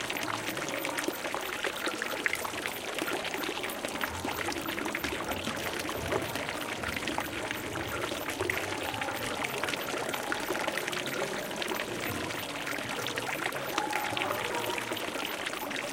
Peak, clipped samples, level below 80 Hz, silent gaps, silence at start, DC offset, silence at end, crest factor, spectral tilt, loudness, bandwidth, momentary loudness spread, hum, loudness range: -8 dBFS; under 0.1%; -58 dBFS; none; 0 s; under 0.1%; 0 s; 26 dB; -2.5 dB/octave; -33 LUFS; 17 kHz; 3 LU; none; 1 LU